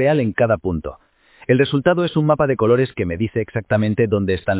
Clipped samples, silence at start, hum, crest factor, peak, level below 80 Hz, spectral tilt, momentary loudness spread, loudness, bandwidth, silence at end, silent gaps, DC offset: under 0.1%; 0 s; none; 16 dB; -2 dBFS; -40 dBFS; -11.5 dB/octave; 8 LU; -18 LUFS; 4 kHz; 0 s; none; under 0.1%